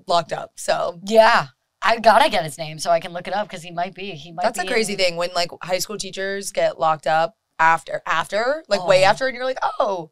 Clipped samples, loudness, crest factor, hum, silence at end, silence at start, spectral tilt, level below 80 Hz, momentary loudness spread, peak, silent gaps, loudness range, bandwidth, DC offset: under 0.1%; -20 LUFS; 20 dB; none; 0 s; 0 s; -3 dB/octave; -52 dBFS; 12 LU; 0 dBFS; none; 5 LU; 16 kHz; 0.8%